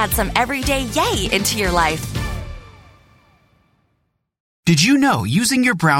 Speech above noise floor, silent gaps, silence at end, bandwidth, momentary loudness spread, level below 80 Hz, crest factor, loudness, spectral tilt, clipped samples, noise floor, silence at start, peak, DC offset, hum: 52 dB; 4.40-4.63 s; 0 s; 16.5 kHz; 12 LU; -34 dBFS; 20 dB; -17 LUFS; -4 dB/octave; under 0.1%; -69 dBFS; 0 s; 0 dBFS; under 0.1%; none